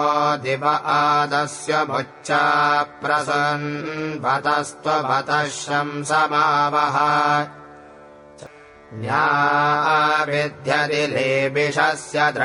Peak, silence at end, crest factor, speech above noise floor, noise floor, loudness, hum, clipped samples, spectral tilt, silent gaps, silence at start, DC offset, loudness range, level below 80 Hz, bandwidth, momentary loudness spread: -4 dBFS; 0 s; 16 dB; 24 dB; -44 dBFS; -19 LUFS; none; under 0.1%; -4 dB/octave; none; 0 s; under 0.1%; 2 LU; -66 dBFS; 11 kHz; 6 LU